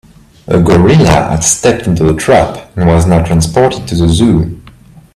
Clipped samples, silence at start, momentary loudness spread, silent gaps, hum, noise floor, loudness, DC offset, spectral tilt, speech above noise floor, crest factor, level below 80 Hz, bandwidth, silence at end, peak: under 0.1%; 0.5 s; 7 LU; none; none; -37 dBFS; -9 LUFS; under 0.1%; -5.5 dB/octave; 29 dB; 10 dB; -28 dBFS; 14 kHz; 0.55 s; 0 dBFS